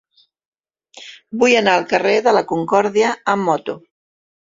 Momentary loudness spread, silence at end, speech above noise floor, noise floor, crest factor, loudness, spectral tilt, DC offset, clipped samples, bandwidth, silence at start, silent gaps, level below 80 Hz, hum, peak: 16 LU; 0.8 s; 30 dB; -46 dBFS; 18 dB; -16 LUFS; -4 dB/octave; under 0.1%; under 0.1%; 7.8 kHz; 0.95 s; none; -62 dBFS; none; 0 dBFS